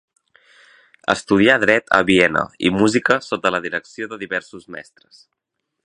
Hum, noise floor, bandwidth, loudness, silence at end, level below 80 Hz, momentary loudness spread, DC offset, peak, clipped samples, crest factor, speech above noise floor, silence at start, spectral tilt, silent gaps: none; -53 dBFS; 10.5 kHz; -17 LUFS; 1.05 s; -52 dBFS; 17 LU; under 0.1%; 0 dBFS; under 0.1%; 20 dB; 34 dB; 1.1 s; -4.5 dB/octave; none